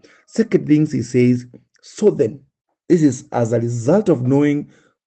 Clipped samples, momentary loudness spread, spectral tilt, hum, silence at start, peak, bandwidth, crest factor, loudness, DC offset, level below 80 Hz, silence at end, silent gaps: under 0.1%; 6 LU; -7.5 dB/octave; none; 0.35 s; -2 dBFS; 8.8 kHz; 16 dB; -17 LUFS; under 0.1%; -60 dBFS; 0.4 s; 2.61-2.65 s